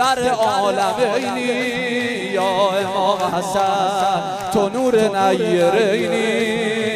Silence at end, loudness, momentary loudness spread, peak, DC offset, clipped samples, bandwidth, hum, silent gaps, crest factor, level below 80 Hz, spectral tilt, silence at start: 0 s; -18 LUFS; 4 LU; -4 dBFS; under 0.1%; under 0.1%; 15.5 kHz; none; none; 14 dB; -56 dBFS; -4 dB/octave; 0 s